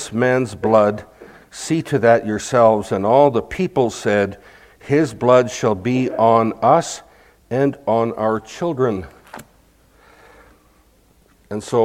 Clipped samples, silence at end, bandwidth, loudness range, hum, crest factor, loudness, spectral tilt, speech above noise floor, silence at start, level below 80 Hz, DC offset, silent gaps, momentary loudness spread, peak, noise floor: under 0.1%; 0 s; 15.5 kHz; 8 LU; none; 18 dB; -17 LUFS; -6 dB/octave; 38 dB; 0 s; -52 dBFS; under 0.1%; none; 12 LU; 0 dBFS; -54 dBFS